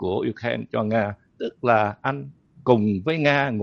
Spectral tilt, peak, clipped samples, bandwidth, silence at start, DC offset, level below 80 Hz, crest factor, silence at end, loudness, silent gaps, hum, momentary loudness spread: -7.5 dB/octave; -2 dBFS; under 0.1%; 6.8 kHz; 0 s; under 0.1%; -60 dBFS; 22 dB; 0 s; -23 LUFS; none; none; 12 LU